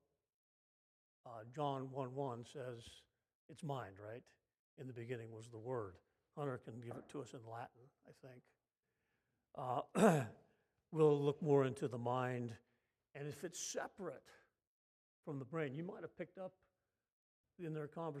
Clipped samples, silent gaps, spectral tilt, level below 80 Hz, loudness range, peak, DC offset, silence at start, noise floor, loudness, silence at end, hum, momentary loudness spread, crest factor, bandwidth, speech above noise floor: under 0.1%; 3.35-3.49 s, 4.59-4.77 s, 14.67-15.23 s, 17.12-17.44 s; -6 dB/octave; -86 dBFS; 13 LU; -18 dBFS; under 0.1%; 1.25 s; under -90 dBFS; -42 LUFS; 0 s; none; 22 LU; 26 dB; 15 kHz; over 48 dB